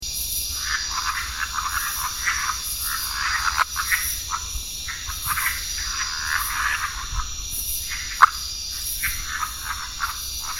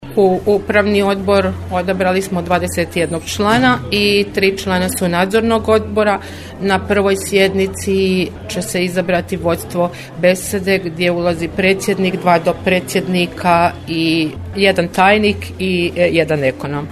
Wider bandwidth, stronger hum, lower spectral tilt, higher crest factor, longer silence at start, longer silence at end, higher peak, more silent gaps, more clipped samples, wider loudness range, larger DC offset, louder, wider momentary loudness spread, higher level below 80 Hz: first, 16.5 kHz vs 14 kHz; neither; second, 1 dB/octave vs -5 dB/octave; first, 26 dB vs 16 dB; about the same, 0 s vs 0 s; about the same, 0 s vs 0 s; about the same, 0 dBFS vs 0 dBFS; neither; neither; about the same, 2 LU vs 2 LU; first, 0.4% vs under 0.1%; second, -24 LUFS vs -15 LUFS; about the same, 7 LU vs 6 LU; about the same, -38 dBFS vs -40 dBFS